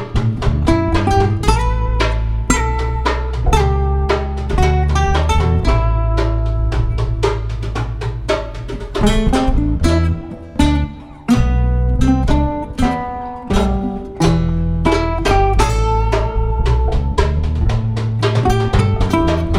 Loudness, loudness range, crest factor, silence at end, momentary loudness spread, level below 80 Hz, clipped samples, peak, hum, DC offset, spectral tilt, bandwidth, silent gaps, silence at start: -17 LUFS; 2 LU; 14 dB; 0 s; 6 LU; -18 dBFS; under 0.1%; 0 dBFS; none; under 0.1%; -6.5 dB/octave; 12 kHz; none; 0 s